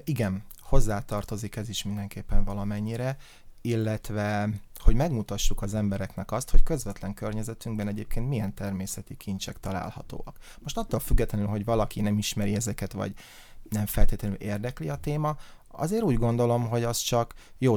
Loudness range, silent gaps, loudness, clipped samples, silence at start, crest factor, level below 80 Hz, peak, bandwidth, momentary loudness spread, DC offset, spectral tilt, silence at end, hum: 4 LU; none; -30 LUFS; under 0.1%; 0.05 s; 20 dB; -30 dBFS; -4 dBFS; 17 kHz; 10 LU; under 0.1%; -5.5 dB/octave; 0 s; none